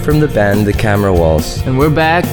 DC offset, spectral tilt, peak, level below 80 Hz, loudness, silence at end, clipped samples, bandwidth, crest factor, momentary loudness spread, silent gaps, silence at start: under 0.1%; -6.5 dB/octave; 0 dBFS; -24 dBFS; -12 LUFS; 0 s; under 0.1%; over 20 kHz; 10 dB; 3 LU; none; 0 s